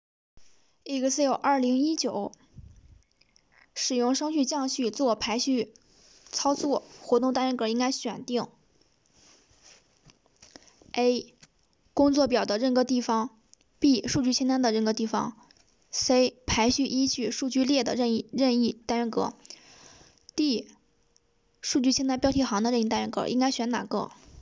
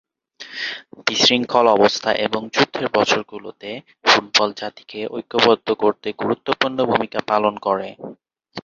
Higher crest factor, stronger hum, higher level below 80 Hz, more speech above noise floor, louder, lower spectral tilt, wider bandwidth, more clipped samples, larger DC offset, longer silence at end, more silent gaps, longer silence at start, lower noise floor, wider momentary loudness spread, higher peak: about the same, 16 dB vs 20 dB; neither; about the same, -56 dBFS vs -60 dBFS; first, 42 dB vs 23 dB; second, -27 LUFS vs -18 LUFS; about the same, -3.5 dB/octave vs -3 dB/octave; about the same, 8 kHz vs 7.6 kHz; neither; neither; about the same, 0 s vs 0.05 s; neither; about the same, 0.35 s vs 0.4 s; first, -68 dBFS vs -42 dBFS; second, 10 LU vs 18 LU; second, -10 dBFS vs 0 dBFS